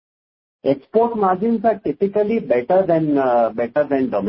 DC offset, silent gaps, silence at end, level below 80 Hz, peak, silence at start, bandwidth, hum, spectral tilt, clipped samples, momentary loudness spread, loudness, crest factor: under 0.1%; none; 0 s; -56 dBFS; -4 dBFS; 0.65 s; 5.8 kHz; none; -12.5 dB/octave; under 0.1%; 4 LU; -18 LUFS; 14 dB